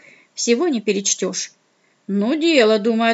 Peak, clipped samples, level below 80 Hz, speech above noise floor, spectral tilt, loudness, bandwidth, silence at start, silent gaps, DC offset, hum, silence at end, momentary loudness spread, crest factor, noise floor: -2 dBFS; under 0.1%; -78 dBFS; 44 dB; -3 dB/octave; -18 LUFS; 8.2 kHz; 0.35 s; none; under 0.1%; none; 0 s; 12 LU; 16 dB; -62 dBFS